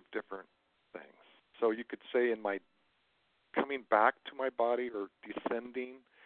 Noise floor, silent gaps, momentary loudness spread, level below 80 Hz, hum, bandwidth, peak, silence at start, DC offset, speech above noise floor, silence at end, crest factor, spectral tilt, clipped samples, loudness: -75 dBFS; none; 19 LU; -82 dBFS; none; 4.4 kHz; -12 dBFS; 0.1 s; under 0.1%; 41 dB; 0.3 s; 24 dB; -2 dB/octave; under 0.1%; -35 LUFS